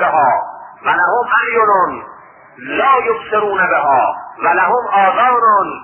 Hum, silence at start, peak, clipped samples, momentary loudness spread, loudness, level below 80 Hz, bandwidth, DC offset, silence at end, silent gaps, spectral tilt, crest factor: none; 0 s; 0 dBFS; under 0.1%; 8 LU; -13 LUFS; -56 dBFS; 3.3 kHz; under 0.1%; 0 s; none; -9.5 dB/octave; 14 dB